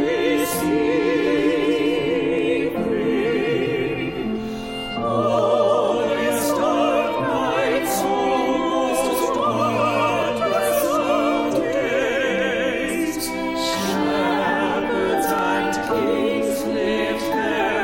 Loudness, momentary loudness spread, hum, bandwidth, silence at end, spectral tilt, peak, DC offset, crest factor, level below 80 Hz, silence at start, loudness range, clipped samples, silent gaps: -21 LUFS; 4 LU; none; 16.5 kHz; 0 s; -4.5 dB/octave; -6 dBFS; under 0.1%; 14 dB; -48 dBFS; 0 s; 1 LU; under 0.1%; none